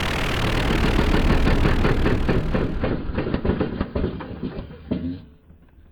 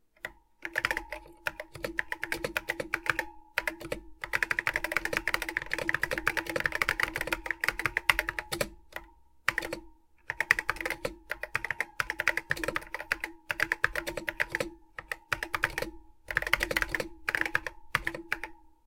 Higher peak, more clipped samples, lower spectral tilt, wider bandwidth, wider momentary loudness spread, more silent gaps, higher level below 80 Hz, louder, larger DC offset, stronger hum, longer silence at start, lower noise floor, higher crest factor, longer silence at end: second, -6 dBFS vs 0 dBFS; neither; first, -6.5 dB/octave vs -2.5 dB/octave; about the same, 17 kHz vs 17 kHz; about the same, 11 LU vs 12 LU; neither; first, -26 dBFS vs -52 dBFS; first, -23 LUFS vs -32 LUFS; neither; neither; second, 0 s vs 0.25 s; second, -49 dBFS vs -55 dBFS; second, 16 dB vs 34 dB; first, 0.65 s vs 0.2 s